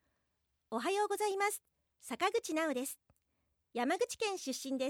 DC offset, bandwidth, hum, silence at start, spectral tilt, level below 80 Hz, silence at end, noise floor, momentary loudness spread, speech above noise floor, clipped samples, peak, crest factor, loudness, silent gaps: under 0.1%; 17.5 kHz; none; 0.7 s; -1.5 dB/octave; -82 dBFS; 0 s; -81 dBFS; 11 LU; 45 dB; under 0.1%; -20 dBFS; 18 dB; -36 LUFS; none